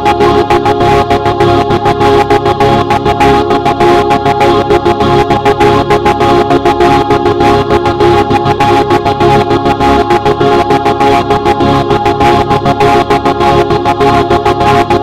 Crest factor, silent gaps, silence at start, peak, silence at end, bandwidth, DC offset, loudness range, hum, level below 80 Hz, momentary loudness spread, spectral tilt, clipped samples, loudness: 8 dB; none; 0 s; 0 dBFS; 0 s; 16 kHz; under 0.1%; 1 LU; none; -26 dBFS; 2 LU; -6.5 dB/octave; 0.9%; -8 LUFS